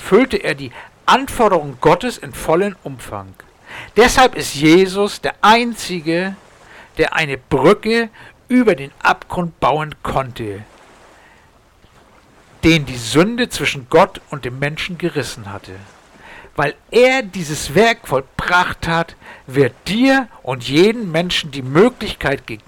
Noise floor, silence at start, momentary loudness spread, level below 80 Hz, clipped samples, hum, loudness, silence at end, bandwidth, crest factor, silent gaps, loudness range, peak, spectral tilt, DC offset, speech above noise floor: -50 dBFS; 0 s; 15 LU; -40 dBFS; under 0.1%; none; -16 LUFS; 0.1 s; 19 kHz; 14 dB; none; 6 LU; -4 dBFS; -5 dB/octave; under 0.1%; 34 dB